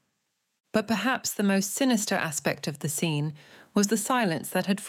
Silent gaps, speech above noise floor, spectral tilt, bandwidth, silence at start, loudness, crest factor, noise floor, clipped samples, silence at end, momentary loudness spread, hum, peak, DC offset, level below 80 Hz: none; 51 dB; -4 dB/octave; 17 kHz; 0.75 s; -27 LUFS; 20 dB; -78 dBFS; under 0.1%; 0 s; 6 LU; none; -8 dBFS; under 0.1%; -72 dBFS